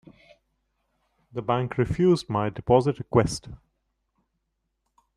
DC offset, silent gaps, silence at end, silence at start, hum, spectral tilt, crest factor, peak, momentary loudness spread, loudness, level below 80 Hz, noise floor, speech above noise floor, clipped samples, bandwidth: under 0.1%; none; 1.6 s; 1.35 s; none; -7 dB/octave; 22 dB; -6 dBFS; 11 LU; -24 LUFS; -50 dBFS; -78 dBFS; 54 dB; under 0.1%; 11.5 kHz